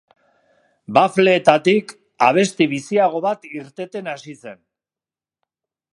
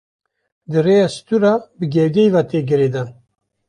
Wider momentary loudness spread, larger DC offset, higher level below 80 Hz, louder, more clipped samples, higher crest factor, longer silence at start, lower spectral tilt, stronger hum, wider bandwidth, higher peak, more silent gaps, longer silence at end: first, 17 LU vs 7 LU; neither; second, -68 dBFS vs -58 dBFS; about the same, -17 LUFS vs -16 LUFS; neither; first, 20 dB vs 14 dB; first, 0.9 s vs 0.7 s; second, -5 dB/octave vs -7.5 dB/octave; neither; about the same, 11.5 kHz vs 11 kHz; first, 0 dBFS vs -4 dBFS; neither; first, 1.4 s vs 0.55 s